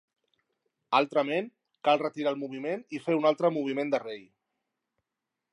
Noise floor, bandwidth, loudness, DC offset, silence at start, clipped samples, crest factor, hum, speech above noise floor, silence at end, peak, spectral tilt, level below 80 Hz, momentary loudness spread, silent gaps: -87 dBFS; 11 kHz; -29 LUFS; under 0.1%; 0.9 s; under 0.1%; 22 dB; none; 59 dB; 1.3 s; -8 dBFS; -6 dB/octave; -86 dBFS; 9 LU; none